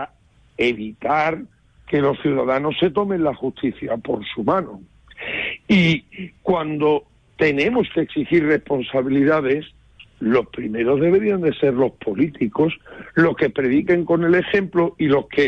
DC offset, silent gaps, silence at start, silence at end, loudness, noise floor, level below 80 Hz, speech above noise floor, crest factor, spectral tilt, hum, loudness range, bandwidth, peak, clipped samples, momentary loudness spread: under 0.1%; none; 0 s; 0 s; -20 LUFS; -54 dBFS; -50 dBFS; 35 dB; 14 dB; -7.5 dB/octave; none; 3 LU; 7.6 kHz; -6 dBFS; under 0.1%; 9 LU